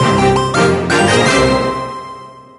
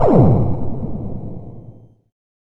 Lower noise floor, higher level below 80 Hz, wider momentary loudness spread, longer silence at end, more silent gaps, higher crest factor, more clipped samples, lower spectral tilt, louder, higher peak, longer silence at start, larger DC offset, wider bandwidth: second, -33 dBFS vs -42 dBFS; about the same, -34 dBFS vs -32 dBFS; second, 17 LU vs 24 LU; second, 0.15 s vs 0.7 s; neither; about the same, 14 dB vs 16 dB; neither; second, -4.5 dB/octave vs -12 dB/octave; first, -12 LUFS vs -18 LUFS; about the same, 0 dBFS vs 0 dBFS; about the same, 0 s vs 0 s; neither; first, 11.5 kHz vs 4.2 kHz